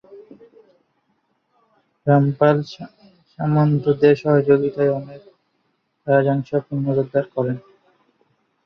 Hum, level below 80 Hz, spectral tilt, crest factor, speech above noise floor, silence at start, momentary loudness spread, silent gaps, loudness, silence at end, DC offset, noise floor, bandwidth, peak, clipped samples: none; -62 dBFS; -9.5 dB/octave; 18 dB; 51 dB; 0.1 s; 16 LU; none; -19 LUFS; 1.05 s; under 0.1%; -69 dBFS; 6.4 kHz; -2 dBFS; under 0.1%